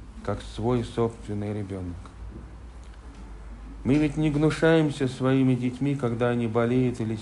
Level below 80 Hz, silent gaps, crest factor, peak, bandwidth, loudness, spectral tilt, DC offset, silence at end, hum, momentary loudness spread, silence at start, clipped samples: -44 dBFS; none; 16 dB; -10 dBFS; 11.5 kHz; -25 LUFS; -7.5 dB/octave; under 0.1%; 0 s; none; 22 LU; 0 s; under 0.1%